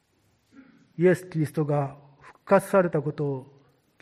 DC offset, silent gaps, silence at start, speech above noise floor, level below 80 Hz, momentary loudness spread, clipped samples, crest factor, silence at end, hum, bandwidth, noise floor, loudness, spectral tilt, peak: under 0.1%; none; 1 s; 44 dB; -68 dBFS; 12 LU; under 0.1%; 20 dB; 0.55 s; none; 15 kHz; -67 dBFS; -25 LUFS; -8 dB/octave; -6 dBFS